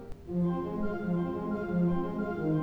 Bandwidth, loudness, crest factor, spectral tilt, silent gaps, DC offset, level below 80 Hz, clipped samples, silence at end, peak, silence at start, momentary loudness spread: 4.5 kHz; -32 LUFS; 12 dB; -10.5 dB/octave; none; under 0.1%; -50 dBFS; under 0.1%; 0 s; -18 dBFS; 0 s; 5 LU